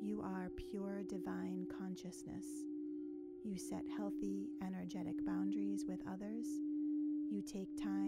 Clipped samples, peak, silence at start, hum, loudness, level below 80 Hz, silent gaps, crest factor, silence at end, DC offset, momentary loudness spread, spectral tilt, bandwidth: under 0.1%; -30 dBFS; 0 s; none; -44 LUFS; -68 dBFS; none; 12 dB; 0 s; under 0.1%; 7 LU; -6.5 dB/octave; 14 kHz